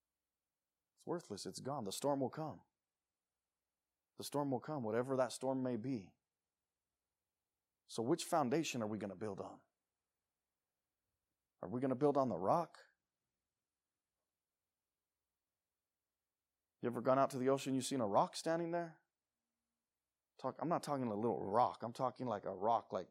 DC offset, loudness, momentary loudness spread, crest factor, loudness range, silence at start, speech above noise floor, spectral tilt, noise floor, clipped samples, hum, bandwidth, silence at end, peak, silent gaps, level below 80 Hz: under 0.1%; -40 LUFS; 12 LU; 22 dB; 7 LU; 1.05 s; over 51 dB; -5.5 dB/octave; under -90 dBFS; under 0.1%; none; 15.5 kHz; 0.05 s; -20 dBFS; none; under -90 dBFS